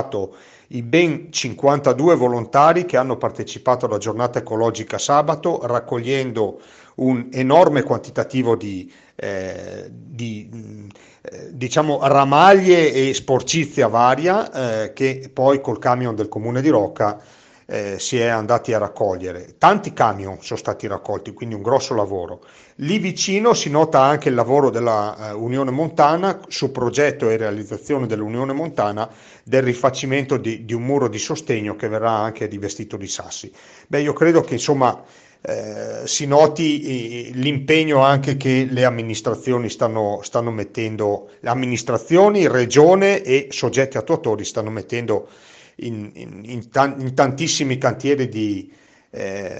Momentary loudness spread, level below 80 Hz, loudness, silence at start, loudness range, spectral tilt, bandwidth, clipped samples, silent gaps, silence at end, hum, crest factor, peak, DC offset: 15 LU; -60 dBFS; -18 LUFS; 0 s; 6 LU; -5 dB/octave; 8.8 kHz; under 0.1%; none; 0 s; none; 18 dB; 0 dBFS; under 0.1%